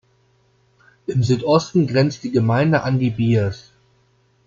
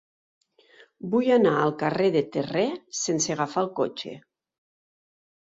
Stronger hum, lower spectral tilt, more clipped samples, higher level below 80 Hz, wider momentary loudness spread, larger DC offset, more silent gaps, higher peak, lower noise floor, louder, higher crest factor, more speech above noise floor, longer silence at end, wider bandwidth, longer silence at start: neither; first, -7 dB/octave vs -4.5 dB/octave; neither; first, -54 dBFS vs -68 dBFS; about the same, 8 LU vs 10 LU; neither; neither; first, -4 dBFS vs -8 dBFS; first, -60 dBFS vs -56 dBFS; first, -19 LUFS vs -25 LUFS; about the same, 16 dB vs 18 dB; first, 42 dB vs 32 dB; second, 0.85 s vs 1.3 s; about the same, 7.6 kHz vs 7.8 kHz; about the same, 1.1 s vs 1.05 s